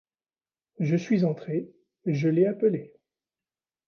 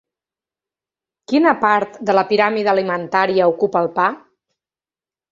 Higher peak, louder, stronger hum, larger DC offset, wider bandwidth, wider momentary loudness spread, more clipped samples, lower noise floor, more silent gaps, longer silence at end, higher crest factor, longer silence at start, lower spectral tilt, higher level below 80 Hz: second, -12 dBFS vs -2 dBFS; second, -26 LUFS vs -17 LUFS; neither; neither; second, 6.8 kHz vs 7.6 kHz; first, 11 LU vs 5 LU; neither; about the same, under -90 dBFS vs under -90 dBFS; neither; second, 1 s vs 1.15 s; about the same, 16 dB vs 18 dB; second, 0.8 s vs 1.3 s; first, -9 dB/octave vs -6.5 dB/octave; second, -74 dBFS vs -64 dBFS